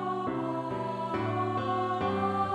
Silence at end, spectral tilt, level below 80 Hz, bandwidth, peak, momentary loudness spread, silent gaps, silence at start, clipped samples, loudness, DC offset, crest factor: 0 s; -7.5 dB/octave; -62 dBFS; 11 kHz; -16 dBFS; 4 LU; none; 0 s; under 0.1%; -31 LUFS; under 0.1%; 14 dB